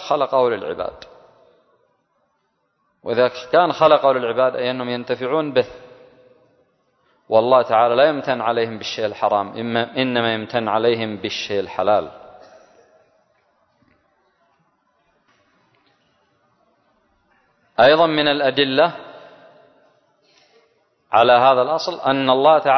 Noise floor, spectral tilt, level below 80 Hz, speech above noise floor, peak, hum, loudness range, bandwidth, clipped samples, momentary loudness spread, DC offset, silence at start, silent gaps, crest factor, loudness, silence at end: -69 dBFS; -5.5 dB/octave; -62 dBFS; 51 dB; -2 dBFS; none; 6 LU; 6.4 kHz; under 0.1%; 11 LU; under 0.1%; 0 s; none; 20 dB; -18 LUFS; 0 s